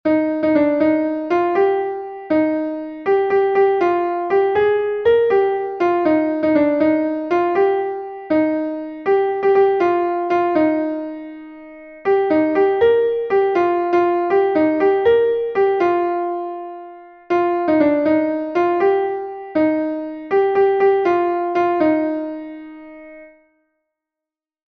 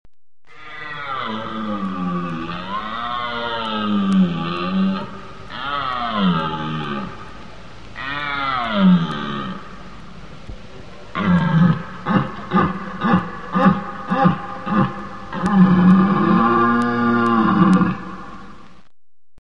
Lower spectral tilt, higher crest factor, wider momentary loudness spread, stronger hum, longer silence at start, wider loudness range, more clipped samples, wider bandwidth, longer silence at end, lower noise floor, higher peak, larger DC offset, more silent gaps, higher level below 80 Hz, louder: about the same, -7.5 dB/octave vs -8 dB/octave; about the same, 14 dB vs 18 dB; second, 11 LU vs 22 LU; neither; second, 0.05 s vs 0.6 s; second, 2 LU vs 8 LU; neither; second, 6.2 kHz vs 7 kHz; first, 1.45 s vs 0.85 s; first, -87 dBFS vs -76 dBFS; about the same, -4 dBFS vs -2 dBFS; second, under 0.1% vs 1%; neither; second, -56 dBFS vs -46 dBFS; about the same, -17 LUFS vs -19 LUFS